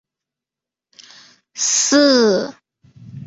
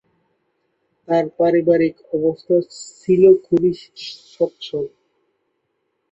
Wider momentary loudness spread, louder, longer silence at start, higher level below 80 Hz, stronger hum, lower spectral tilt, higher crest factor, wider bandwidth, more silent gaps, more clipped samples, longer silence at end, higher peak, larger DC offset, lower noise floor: about the same, 17 LU vs 19 LU; first, -14 LUFS vs -18 LUFS; first, 1.55 s vs 1.1 s; about the same, -62 dBFS vs -60 dBFS; neither; second, -2 dB/octave vs -7 dB/octave; about the same, 18 dB vs 18 dB; about the same, 8.2 kHz vs 8.2 kHz; neither; neither; second, 0 s vs 1.25 s; about the same, -2 dBFS vs -2 dBFS; neither; first, -88 dBFS vs -71 dBFS